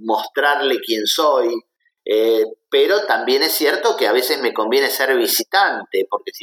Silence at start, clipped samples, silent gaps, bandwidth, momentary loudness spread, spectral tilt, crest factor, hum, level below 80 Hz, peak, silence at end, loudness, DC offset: 0 s; under 0.1%; none; 19 kHz; 6 LU; -1 dB/octave; 16 dB; none; -82 dBFS; -2 dBFS; 0 s; -17 LUFS; under 0.1%